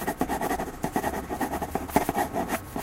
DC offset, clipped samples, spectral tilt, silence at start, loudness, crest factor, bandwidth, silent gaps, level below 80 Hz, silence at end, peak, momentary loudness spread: under 0.1%; under 0.1%; -5 dB/octave; 0 s; -29 LUFS; 22 dB; 16.5 kHz; none; -44 dBFS; 0 s; -6 dBFS; 5 LU